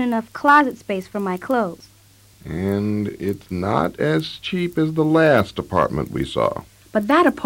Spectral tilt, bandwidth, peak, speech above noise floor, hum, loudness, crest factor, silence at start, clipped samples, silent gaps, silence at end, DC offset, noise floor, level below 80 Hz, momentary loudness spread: -6.5 dB/octave; 16.5 kHz; -4 dBFS; 31 dB; none; -20 LUFS; 16 dB; 0 s; under 0.1%; none; 0 s; under 0.1%; -51 dBFS; -48 dBFS; 11 LU